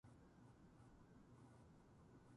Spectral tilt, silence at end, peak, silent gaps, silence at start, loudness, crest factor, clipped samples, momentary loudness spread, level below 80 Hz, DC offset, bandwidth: -7 dB/octave; 0 s; -54 dBFS; none; 0.05 s; -68 LUFS; 12 dB; under 0.1%; 1 LU; -76 dBFS; under 0.1%; 11 kHz